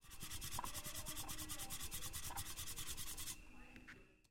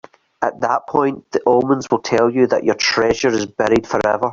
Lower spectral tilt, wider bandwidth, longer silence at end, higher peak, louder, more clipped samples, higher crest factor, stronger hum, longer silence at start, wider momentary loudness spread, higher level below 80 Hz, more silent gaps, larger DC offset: second, -1.5 dB/octave vs -4.5 dB/octave; first, 16.5 kHz vs 7.6 kHz; first, 0.15 s vs 0 s; second, -30 dBFS vs -2 dBFS; second, -47 LUFS vs -17 LUFS; neither; about the same, 18 dB vs 16 dB; neither; second, 0 s vs 0.4 s; first, 13 LU vs 5 LU; second, -58 dBFS vs -48 dBFS; neither; neither